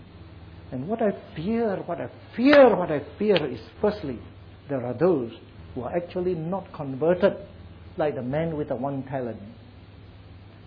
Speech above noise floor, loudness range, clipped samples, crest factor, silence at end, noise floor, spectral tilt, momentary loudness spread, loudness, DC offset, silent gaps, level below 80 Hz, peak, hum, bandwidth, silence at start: 22 dB; 6 LU; under 0.1%; 20 dB; 0.15 s; -46 dBFS; -9 dB/octave; 20 LU; -25 LUFS; under 0.1%; none; -54 dBFS; -6 dBFS; none; 5.2 kHz; 0 s